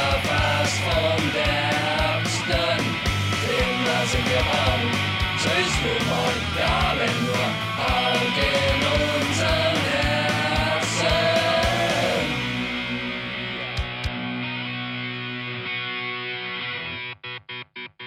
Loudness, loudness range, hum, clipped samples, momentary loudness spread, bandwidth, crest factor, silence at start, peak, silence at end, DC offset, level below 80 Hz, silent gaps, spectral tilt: -22 LUFS; 7 LU; none; under 0.1%; 8 LU; 16.5 kHz; 14 dB; 0 s; -10 dBFS; 0 s; under 0.1%; -36 dBFS; none; -4 dB/octave